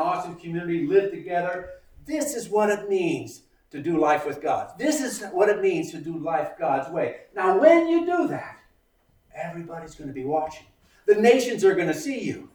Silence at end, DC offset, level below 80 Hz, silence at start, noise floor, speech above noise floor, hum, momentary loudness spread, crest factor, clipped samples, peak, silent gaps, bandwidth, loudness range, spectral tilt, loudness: 0.1 s; under 0.1%; -60 dBFS; 0 s; -64 dBFS; 40 dB; none; 16 LU; 22 dB; under 0.1%; -2 dBFS; none; over 20 kHz; 4 LU; -5 dB/octave; -24 LUFS